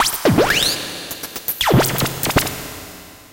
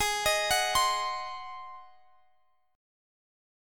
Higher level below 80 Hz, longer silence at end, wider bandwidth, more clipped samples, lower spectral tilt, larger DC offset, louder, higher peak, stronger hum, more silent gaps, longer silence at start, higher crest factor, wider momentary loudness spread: first, -38 dBFS vs -56 dBFS; second, 0.1 s vs 1 s; about the same, 17.5 kHz vs 17.5 kHz; neither; first, -3.5 dB/octave vs 0.5 dB/octave; neither; first, -18 LUFS vs -27 LUFS; first, -4 dBFS vs -14 dBFS; neither; neither; about the same, 0 s vs 0 s; about the same, 16 dB vs 20 dB; about the same, 17 LU vs 18 LU